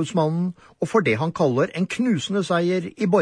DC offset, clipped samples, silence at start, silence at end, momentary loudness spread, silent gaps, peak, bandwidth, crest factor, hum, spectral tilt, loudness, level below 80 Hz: under 0.1%; under 0.1%; 0 s; 0 s; 4 LU; none; -6 dBFS; 10.5 kHz; 16 dB; none; -6.5 dB/octave; -22 LUFS; -62 dBFS